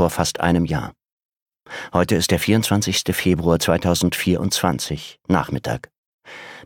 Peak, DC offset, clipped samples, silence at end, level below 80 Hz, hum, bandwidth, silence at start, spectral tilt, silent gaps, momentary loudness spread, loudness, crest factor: -2 dBFS; under 0.1%; under 0.1%; 0.05 s; -42 dBFS; none; 18.5 kHz; 0 s; -4.5 dB/octave; 1.12-1.17 s, 1.25-1.29 s, 1.42-1.46 s, 5.98-6.19 s; 14 LU; -20 LUFS; 20 dB